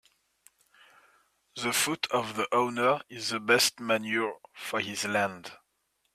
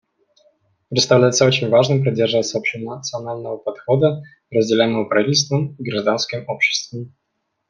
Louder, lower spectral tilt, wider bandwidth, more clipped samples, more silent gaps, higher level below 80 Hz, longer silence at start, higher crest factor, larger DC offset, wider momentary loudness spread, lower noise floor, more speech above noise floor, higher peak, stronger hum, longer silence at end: second, -28 LUFS vs -18 LUFS; second, -2.5 dB/octave vs -4.5 dB/octave; first, 15.5 kHz vs 10 kHz; neither; neither; second, -74 dBFS vs -62 dBFS; first, 1.55 s vs 0.9 s; about the same, 22 dB vs 18 dB; neither; about the same, 11 LU vs 13 LU; first, -76 dBFS vs -60 dBFS; first, 47 dB vs 41 dB; second, -10 dBFS vs -2 dBFS; neither; about the same, 0.6 s vs 0.6 s